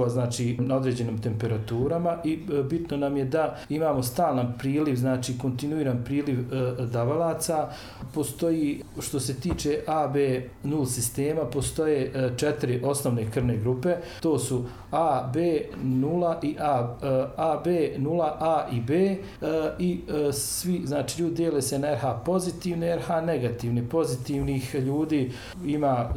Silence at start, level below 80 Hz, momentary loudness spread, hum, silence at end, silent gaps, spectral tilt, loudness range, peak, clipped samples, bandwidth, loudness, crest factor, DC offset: 0 s; -48 dBFS; 4 LU; none; 0 s; none; -6 dB/octave; 2 LU; -14 dBFS; under 0.1%; 17 kHz; -27 LUFS; 14 dB; under 0.1%